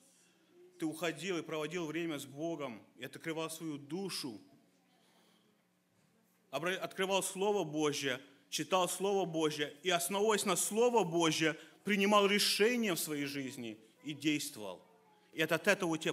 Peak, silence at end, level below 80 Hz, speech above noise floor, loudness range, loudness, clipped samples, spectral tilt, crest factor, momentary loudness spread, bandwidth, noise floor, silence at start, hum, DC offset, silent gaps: -14 dBFS; 0 s; -84 dBFS; 39 dB; 13 LU; -34 LUFS; under 0.1%; -3.5 dB/octave; 22 dB; 15 LU; 16 kHz; -74 dBFS; 0.6 s; none; under 0.1%; none